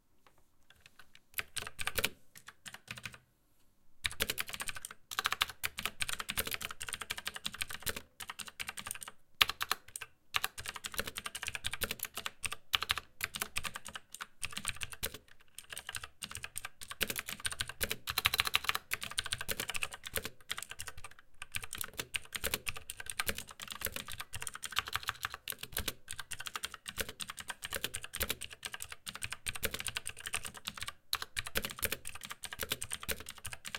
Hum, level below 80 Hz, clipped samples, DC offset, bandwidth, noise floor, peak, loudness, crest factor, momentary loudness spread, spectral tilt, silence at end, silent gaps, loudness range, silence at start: none; -58 dBFS; under 0.1%; under 0.1%; 17 kHz; -67 dBFS; -2 dBFS; -38 LUFS; 38 dB; 11 LU; -0.5 dB/octave; 0 s; none; 6 LU; 0.15 s